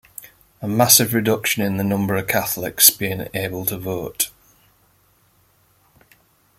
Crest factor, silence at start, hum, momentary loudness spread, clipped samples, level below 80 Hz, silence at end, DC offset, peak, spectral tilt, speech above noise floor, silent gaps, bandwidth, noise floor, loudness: 22 dB; 0.2 s; none; 14 LU; under 0.1%; -56 dBFS; 2.3 s; under 0.1%; 0 dBFS; -3 dB/octave; 40 dB; none; 16.5 kHz; -59 dBFS; -18 LUFS